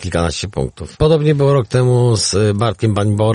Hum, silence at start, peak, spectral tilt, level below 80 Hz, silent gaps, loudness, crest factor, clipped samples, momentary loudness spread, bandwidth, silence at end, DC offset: none; 0 s; 0 dBFS; -6 dB/octave; -34 dBFS; none; -15 LUFS; 14 dB; under 0.1%; 8 LU; 10.5 kHz; 0 s; under 0.1%